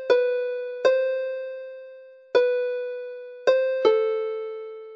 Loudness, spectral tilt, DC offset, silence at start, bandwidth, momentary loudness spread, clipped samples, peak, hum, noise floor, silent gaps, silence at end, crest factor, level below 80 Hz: -24 LUFS; -3 dB/octave; under 0.1%; 0 s; 7.2 kHz; 16 LU; under 0.1%; -6 dBFS; none; -46 dBFS; none; 0 s; 18 dB; -80 dBFS